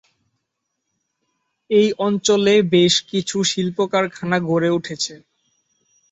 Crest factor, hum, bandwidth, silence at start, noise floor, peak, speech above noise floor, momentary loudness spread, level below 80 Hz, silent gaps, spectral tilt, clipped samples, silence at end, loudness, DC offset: 18 dB; none; 8.2 kHz; 1.7 s; -77 dBFS; -2 dBFS; 59 dB; 8 LU; -62 dBFS; none; -4 dB/octave; under 0.1%; 0.95 s; -18 LUFS; under 0.1%